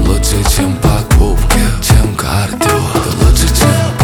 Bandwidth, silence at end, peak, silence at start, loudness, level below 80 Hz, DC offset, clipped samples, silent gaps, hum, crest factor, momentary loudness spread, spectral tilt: 19.5 kHz; 0 s; 0 dBFS; 0 s; -11 LUFS; -14 dBFS; under 0.1%; under 0.1%; none; none; 10 dB; 4 LU; -5 dB/octave